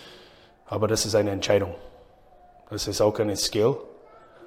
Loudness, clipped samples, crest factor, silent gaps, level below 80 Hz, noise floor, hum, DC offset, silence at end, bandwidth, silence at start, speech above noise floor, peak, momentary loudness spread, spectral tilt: -25 LUFS; under 0.1%; 18 dB; none; -52 dBFS; -53 dBFS; none; under 0.1%; 0 s; 16.5 kHz; 0 s; 29 dB; -8 dBFS; 12 LU; -4 dB/octave